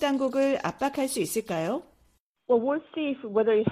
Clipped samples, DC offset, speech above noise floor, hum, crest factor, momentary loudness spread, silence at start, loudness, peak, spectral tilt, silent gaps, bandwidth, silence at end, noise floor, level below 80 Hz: under 0.1%; under 0.1%; 41 dB; none; 16 dB; 7 LU; 0 s; -27 LUFS; -10 dBFS; -5 dB/octave; 2.20-2.35 s; 15 kHz; 0 s; -67 dBFS; -66 dBFS